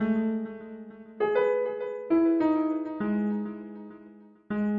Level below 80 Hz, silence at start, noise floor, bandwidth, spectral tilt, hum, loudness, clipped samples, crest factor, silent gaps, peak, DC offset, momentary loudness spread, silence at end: -66 dBFS; 0 s; -51 dBFS; 4.5 kHz; -10 dB/octave; none; -28 LUFS; under 0.1%; 14 dB; none; -14 dBFS; under 0.1%; 19 LU; 0 s